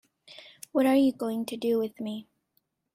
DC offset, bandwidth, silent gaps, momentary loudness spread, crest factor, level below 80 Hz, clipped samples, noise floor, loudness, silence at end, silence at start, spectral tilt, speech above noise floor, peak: under 0.1%; 15.5 kHz; none; 23 LU; 16 dB; -72 dBFS; under 0.1%; -75 dBFS; -27 LUFS; 0.75 s; 0.3 s; -5.5 dB/octave; 49 dB; -12 dBFS